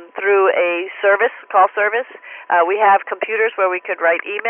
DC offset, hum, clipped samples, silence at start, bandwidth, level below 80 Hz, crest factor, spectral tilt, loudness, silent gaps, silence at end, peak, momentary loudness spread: under 0.1%; none; under 0.1%; 0 s; 3.5 kHz; under -90 dBFS; 14 dB; -7.5 dB/octave; -16 LUFS; none; 0 s; -2 dBFS; 5 LU